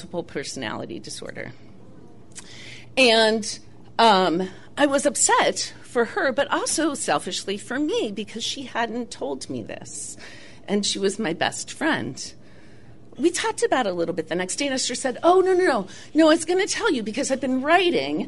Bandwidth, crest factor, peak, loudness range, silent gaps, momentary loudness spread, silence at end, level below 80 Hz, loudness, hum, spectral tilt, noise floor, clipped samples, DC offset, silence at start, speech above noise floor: 11.5 kHz; 18 dB; -6 dBFS; 7 LU; none; 17 LU; 0 s; -60 dBFS; -22 LUFS; none; -3 dB/octave; -49 dBFS; under 0.1%; 0.7%; 0 s; 26 dB